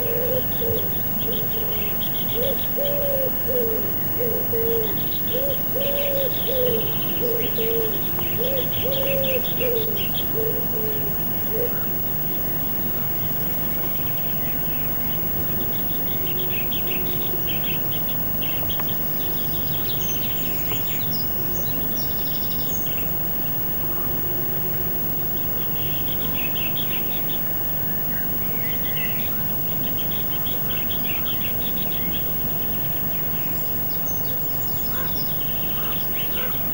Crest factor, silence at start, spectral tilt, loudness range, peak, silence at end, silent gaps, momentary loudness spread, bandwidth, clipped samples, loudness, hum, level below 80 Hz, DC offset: 12 dB; 0 s; -5 dB/octave; 1 LU; -10 dBFS; 0 s; none; 1 LU; 19 kHz; under 0.1%; -20 LUFS; none; -42 dBFS; 0.8%